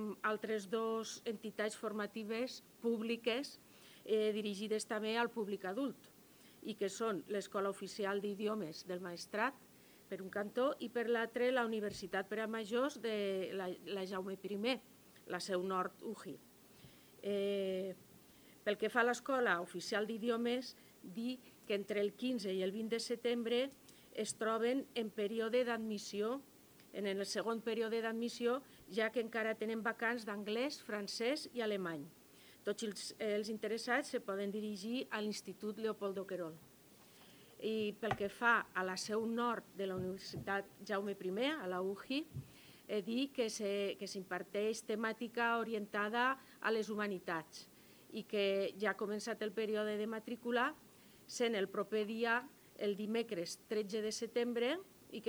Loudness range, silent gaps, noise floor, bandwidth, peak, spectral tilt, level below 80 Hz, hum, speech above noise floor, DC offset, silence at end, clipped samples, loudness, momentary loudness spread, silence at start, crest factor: 3 LU; none; -63 dBFS; over 20 kHz; -18 dBFS; -4 dB/octave; -80 dBFS; none; 24 dB; under 0.1%; 0 s; under 0.1%; -40 LUFS; 9 LU; 0 s; 22 dB